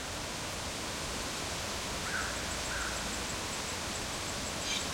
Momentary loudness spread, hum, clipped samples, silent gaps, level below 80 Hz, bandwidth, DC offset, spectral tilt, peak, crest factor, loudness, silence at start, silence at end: 3 LU; none; under 0.1%; none; -50 dBFS; 16.5 kHz; under 0.1%; -2 dB/octave; -20 dBFS; 16 dB; -35 LUFS; 0 s; 0 s